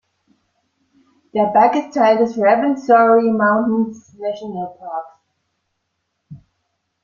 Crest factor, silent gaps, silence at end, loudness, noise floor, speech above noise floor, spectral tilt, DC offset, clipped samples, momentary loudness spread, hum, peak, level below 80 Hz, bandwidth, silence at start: 16 dB; none; 0.65 s; -16 LUFS; -73 dBFS; 57 dB; -7 dB/octave; under 0.1%; under 0.1%; 15 LU; none; -2 dBFS; -64 dBFS; 7.2 kHz; 1.35 s